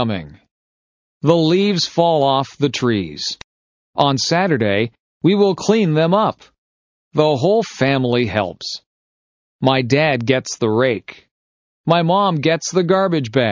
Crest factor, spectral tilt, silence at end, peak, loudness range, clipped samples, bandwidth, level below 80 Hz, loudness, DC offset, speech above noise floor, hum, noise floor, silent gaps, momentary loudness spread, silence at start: 18 dB; -5.5 dB/octave; 0 s; 0 dBFS; 2 LU; under 0.1%; 7.6 kHz; -52 dBFS; -17 LUFS; under 0.1%; over 74 dB; none; under -90 dBFS; 0.51-1.21 s, 3.44-3.93 s, 5.00-5.21 s, 6.58-7.11 s, 8.86-9.59 s, 11.31-11.84 s; 9 LU; 0 s